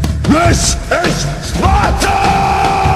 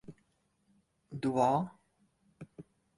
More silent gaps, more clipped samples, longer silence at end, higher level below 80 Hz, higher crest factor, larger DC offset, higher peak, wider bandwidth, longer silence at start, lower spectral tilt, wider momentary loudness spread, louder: neither; neither; second, 0 s vs 0.35 s; first, -20 dBFS vs -74 dBFS; second, 12 dB vs 22 dB; neither; first, 0 dBFS vs -16 dBFS; first, 15 kHz vs 11.5 kHz; about the same, 0 s vs 0.1 s; second, -4.5 dB/octave vs -7.5 dB/octave; second, 5 LU vs 23 LU; first, -12 LUFS vs -32 LUFS